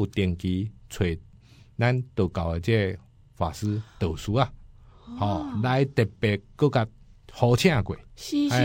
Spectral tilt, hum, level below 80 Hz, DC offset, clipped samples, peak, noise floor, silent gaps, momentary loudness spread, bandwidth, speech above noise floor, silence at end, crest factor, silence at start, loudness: -6.5 dB/octave; none; -46 dBFS; under 0.1%; under 0.1%; -6 dBFS; -52 dBFS; none; 11 LU; 16.5 kHz; 27 dB; 0 s; 20 dB; 0 s; -26 LUFS